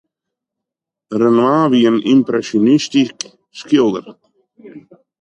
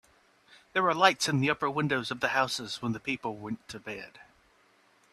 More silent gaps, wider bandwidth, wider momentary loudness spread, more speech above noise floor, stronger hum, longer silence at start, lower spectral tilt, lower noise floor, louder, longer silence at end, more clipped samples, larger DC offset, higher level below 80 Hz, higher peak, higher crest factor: neither; second, 9.2 kHz vs 14 kHz; about the same, 15 LU vs 16 LU; first, 69 dB vs 35 dB; neither; first, 1.1 s vs 0.75 s; first, -5.5 dB/octave vs -4 dB/octave; first, -83 dBFS vs -65 dBFS; first, -14 LUFS vs -29 LUFS; second, 0.45 s vs 0.9 s; neither; neither; about the same, -64 dBFS vs -68 dBFS; about the same, -2 dBFS vs -4 dBFS; second, 14 dB vs 26 dB